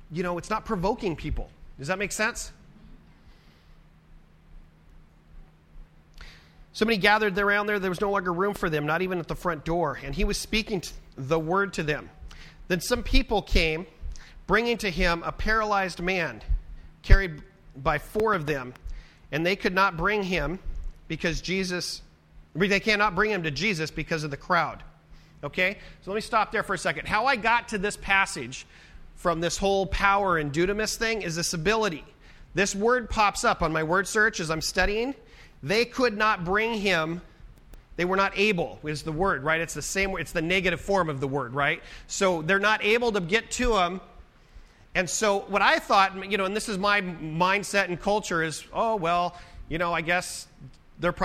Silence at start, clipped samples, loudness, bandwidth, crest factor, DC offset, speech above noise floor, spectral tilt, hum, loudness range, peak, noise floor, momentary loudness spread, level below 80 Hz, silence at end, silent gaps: 0 s; under 0.1%; -26 LUFS; 15.5 kHz; 24 dB; under 0.1%; 28 dB; -4 dB/octave; none; 3 LU; -2 dBFS; -54 dBFS; 12 LU; -36 dBFS; 0 s; none